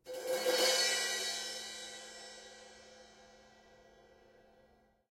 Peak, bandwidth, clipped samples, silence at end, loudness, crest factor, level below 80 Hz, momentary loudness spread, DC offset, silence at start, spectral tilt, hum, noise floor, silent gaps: -16 dBFS; 16 kHz; under 0.1%; 1.35 s; -33 LUFS; 22 dB; -76 dBFS; 26 LU; under 0.1%; 0.05 s; 1 dB/octave; none; -69 dBFS; none